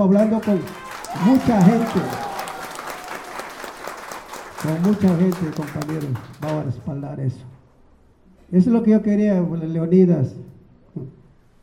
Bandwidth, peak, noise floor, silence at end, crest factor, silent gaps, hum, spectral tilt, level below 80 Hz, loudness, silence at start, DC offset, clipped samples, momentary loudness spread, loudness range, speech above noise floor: 16.5 kHz; -2 dBFS; -52 dBFS; 0.5 s; 18 dB; none; none; -7.5 dB/octave; -54 dBFS; -20 LUFS; 0 s; under 0.1%; under 0.1%; 18 LU; 6 LU; 34 dB